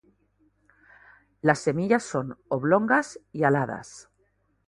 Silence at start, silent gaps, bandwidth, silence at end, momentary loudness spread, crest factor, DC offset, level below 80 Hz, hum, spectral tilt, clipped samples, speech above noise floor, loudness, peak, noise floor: 1.45 s; none; 11.5 kHz; 0.65 s; 12 LU; 24 dB; under 0.1%; -64 dBFS; 50 Hz at -55 dBFS; -6.5 dB/octave; under 0.1%; 45 dB; -25 LUFS; -4 dBFS; -69 dBFS